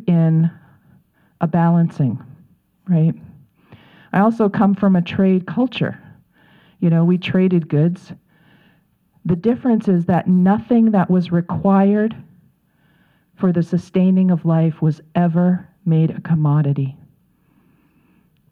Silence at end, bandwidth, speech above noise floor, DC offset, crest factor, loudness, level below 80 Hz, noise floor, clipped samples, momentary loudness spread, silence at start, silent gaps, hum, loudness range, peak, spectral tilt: 1.6 s; 4.8 kHz; 43 dB; under 0.1%; 16 dB; -17 LUFS; -56 dBFS; -59 dBFS; under 0.1%; 8 LU; 0.05 s; none; none; 4 LU; -2 dBFS; -10 dB/octave